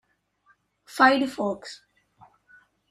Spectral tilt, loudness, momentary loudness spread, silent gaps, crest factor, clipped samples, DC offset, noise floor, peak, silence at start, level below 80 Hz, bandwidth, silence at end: -4 dB/octave; -22 LUFS; 23 LU; none; 22 dB; under 0.1%; under 0.1%; -65 dBFS; -4 dBFS; 0.95 s; -70 dBFS; 14 kHz; 1.15 s